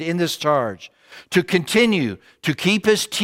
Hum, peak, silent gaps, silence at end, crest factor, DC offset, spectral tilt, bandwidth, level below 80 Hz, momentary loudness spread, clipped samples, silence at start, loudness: none; -2 dBFS; none; 0 s; 18 dB; under 0.1%; -4.5 dB/octave; 16.5 kHz; -60 dBFS; 11 LU; under 0.1%; 0 s; -20 LUFS